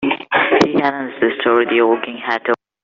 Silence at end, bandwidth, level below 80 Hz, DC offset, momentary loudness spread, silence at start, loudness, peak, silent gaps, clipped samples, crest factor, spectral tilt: 0.3 s; 7.6 kHz; -58 dBFS; under 0.1%; 7 LU; 0 s; -16 LUFS; -2 dBFS; none; under 0.1%; 14 dB; -2.5 dB/octave